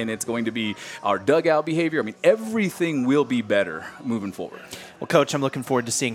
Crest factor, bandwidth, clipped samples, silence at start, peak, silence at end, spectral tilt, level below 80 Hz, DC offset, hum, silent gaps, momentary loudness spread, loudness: 20 dB; 16.5 kHz; under 0.1%; 0 s; -4 dBFS; 0 s; -4.5 dB/octave; -68 dBFS; under 0.1%; none; none; 12 LU; -23 LUFS